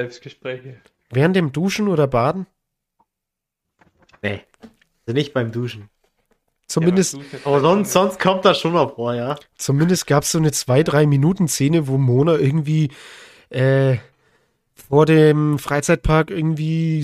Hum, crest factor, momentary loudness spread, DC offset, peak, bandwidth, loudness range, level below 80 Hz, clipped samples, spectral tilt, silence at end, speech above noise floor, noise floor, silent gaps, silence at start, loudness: none; 16 dB; 14 LU; under 0.1%; -2 dBFS; 15.5 kHz; 11 LU; -42 dBFS; under 0.1%; -6 dB/octave; 0 s; 65 dB; -82 dBFS; none; 0 s; -18 LUFS